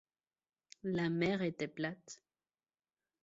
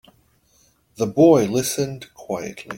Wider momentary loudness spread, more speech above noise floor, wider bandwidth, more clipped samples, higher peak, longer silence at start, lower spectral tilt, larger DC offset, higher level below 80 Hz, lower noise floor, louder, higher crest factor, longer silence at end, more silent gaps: first, 19 LU vs 15 LU; first, over 53 dB vs 41 dB; second, 7.6 kHz vs 17 kHz; neither; second, -20 dBFS vs -2 dBFS; second, 0.85 s vs 1 s; about the same, -5.5 dB/octave vs -5.5 dB/octave; neither; second, -76 dBFS vs -58 dBFS; first, under -90 dBFS vs -60 dBFS; second, -38 LUFS vs -20 LUFS; about the same, 20 dB vs 18 dB; first, 1.1 s vs 0 s; neither